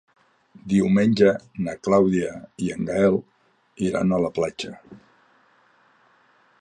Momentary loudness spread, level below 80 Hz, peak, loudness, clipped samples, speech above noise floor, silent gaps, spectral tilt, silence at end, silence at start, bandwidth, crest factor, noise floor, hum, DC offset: 12 LU; -54 dBFS; -4 dBFS; -22 LUFS; under 0.1%; 38 dB; none; -7 dB/octave; 1.65 s; 0.65 s; 10 kHz; 18 dB; -60 dBFS; none; under 0.1%